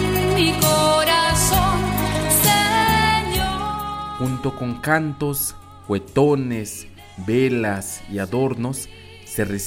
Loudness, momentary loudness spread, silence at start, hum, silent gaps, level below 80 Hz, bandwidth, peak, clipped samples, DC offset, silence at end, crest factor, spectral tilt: -19 LUFS; 12 LU; 0 s; none; none; -36 dBFS; 16.5 kHz; -4 dBFS; under 0.1%; under 0.1%; 0 s; 16 dB; -4 dB/octave